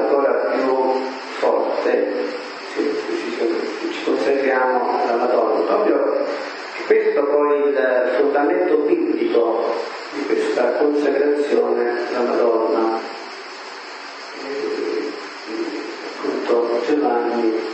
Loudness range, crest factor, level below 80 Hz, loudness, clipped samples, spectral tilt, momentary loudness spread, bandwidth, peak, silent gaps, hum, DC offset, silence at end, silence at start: 6 LU; 16 dB; -82 dBFS; -20 LUFS; under 0.1%; -4 dB/octave; 11 LU; 8.6 kHz; -4 dBFS; none; none; under 0.1%; 0 s; 0 s